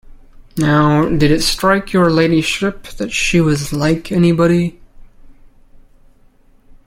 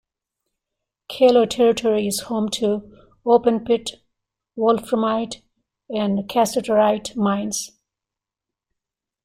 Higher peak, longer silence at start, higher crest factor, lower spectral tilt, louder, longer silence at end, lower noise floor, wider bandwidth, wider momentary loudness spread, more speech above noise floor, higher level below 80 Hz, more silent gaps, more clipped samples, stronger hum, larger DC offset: first, 0 dBFS vs -4 dBFS; second, 0.1 s vs 1.1 s; about the same, 14 dB vs 18 dB; about the same, -5.5 dB/octave vs -4.5 dB/octave; first, -14 LUFS vs -20 LUFS; about the same, 1.6 s vs 1.6 s; second, -48 dBFS vs -87 dBFS; about the same, 16.5 kHz vs 16 kHz; second, 8 LU vs 13 LU; second, 35 dB vs 68 dB; first, -34 dBFS vs -58 dBFS; neither; neither; neither; neither